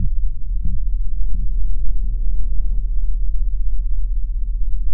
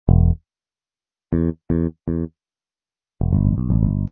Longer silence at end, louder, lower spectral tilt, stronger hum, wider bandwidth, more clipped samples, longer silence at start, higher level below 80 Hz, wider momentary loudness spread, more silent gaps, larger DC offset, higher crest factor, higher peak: about the same, 0 s vs 0.05 s; second, -26 LUFS vs -21 LUFS; first, -16.5 dB/octave vs -15 dB/octave; neither; second, 0.5 kHz vs 2.3 kHz; neither; about the same, 0 s vs 0.05 s; first, -18 dBFS vs -26 dBFS; second, 1 LU vs 9 LU; neither; neither; second, 10 dB vs 20 dB; second, -4 dBFS vs 0 dBFS